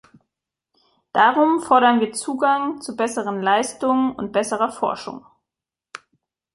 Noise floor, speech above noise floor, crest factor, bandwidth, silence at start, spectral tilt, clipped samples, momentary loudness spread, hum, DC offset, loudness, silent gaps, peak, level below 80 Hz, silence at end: -87 dBFS; 68 dB; 20 dB; 11.5 kHz; 1.15 s; -3.5 dB/octave; under 0.1%; 21 LU; none; under 0.1%; -20 LUFS; none; -2 dBFS; -66 dBFS; 0.6 s